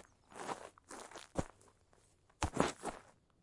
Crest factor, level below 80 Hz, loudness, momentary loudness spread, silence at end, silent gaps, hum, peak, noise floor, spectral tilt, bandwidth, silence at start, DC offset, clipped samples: 32 dB; -58 dBFS; -43 LUFS; 17 LU; 0.3 s; none; none; -12 dBFS; -70 dBFS; -4.5 dB/octave; 11.5 kHz; 0.3 s; under 0.1%; under 0.1%